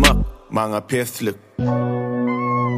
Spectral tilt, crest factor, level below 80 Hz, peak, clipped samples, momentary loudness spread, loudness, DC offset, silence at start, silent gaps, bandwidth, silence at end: -5 dB/octave; 20 dB; -28 dBFS; 0 dBFS; under 0.1%; 5 LU; -22 LUFS; under 0.1%; 0 s; none; 15.5 kHz; 0 s